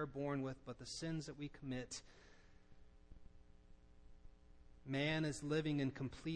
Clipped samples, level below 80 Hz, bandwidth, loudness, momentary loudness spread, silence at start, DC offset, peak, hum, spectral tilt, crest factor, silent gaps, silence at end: under 0.1%; -64 dBFS; 10.5 kHz; -44 LUFS; 12 LU; 0 s; under 0.1%; -28 dBFS; none; -5.5 dB/octave; 18 dB; none; 0 s